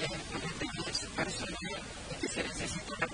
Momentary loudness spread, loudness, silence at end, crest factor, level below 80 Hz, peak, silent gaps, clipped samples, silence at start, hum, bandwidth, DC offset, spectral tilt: 4 LU; -37 LUFS; 0 s; 20 dB; -52 dBFS; -18 dBFS; none; under 0.1%; 0 s; none; 10 kHz; under 0.1%; -3 dB/octave